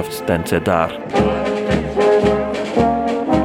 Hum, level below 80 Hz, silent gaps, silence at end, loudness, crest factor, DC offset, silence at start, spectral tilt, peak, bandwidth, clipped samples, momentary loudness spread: none; -36 dBFS; none; 0 s; -17 LUFS; 16 dB; under 0.1%; 0 s; -6.5 dB/octave; -2 dBFS; 17 kHz; under 0.1%; 5 LU